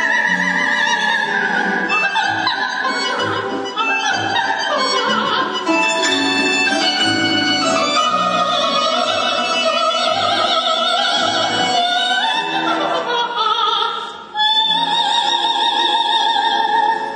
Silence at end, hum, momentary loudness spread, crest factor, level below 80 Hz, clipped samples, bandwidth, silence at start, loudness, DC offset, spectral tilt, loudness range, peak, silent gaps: 0 s; none; 4 LU; 14 dB; -66 dBFS; under 0.1%; 10.5 kHz; 0 s; -15 LUFS; under 0.1%; -2 dB/octave; 2 LU; -4 dBFS; none